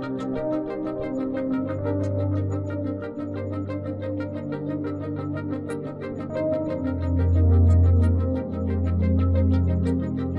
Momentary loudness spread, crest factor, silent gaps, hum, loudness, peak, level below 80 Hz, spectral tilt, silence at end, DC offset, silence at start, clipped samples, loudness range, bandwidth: 11 LU; 14 dB; none; none; -25 LUFS; -10 dBFS; -40 dBFS; -10 dB/octave; 0 s; under 0.1%; 0 s; under 0.1%; 8 LU; 4.5 kHz